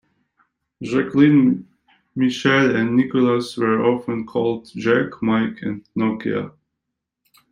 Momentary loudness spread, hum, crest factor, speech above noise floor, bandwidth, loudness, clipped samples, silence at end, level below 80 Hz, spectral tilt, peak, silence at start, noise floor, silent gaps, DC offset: 11 LU; none; 18 dB; 62 dB; 11 kHz; -19 LUFS; under 0.1%; 1 s; -60 dBFS; -7 dB/octave; -2 dBFS; 0.8 s; -81 dBFS; none; under 0.1%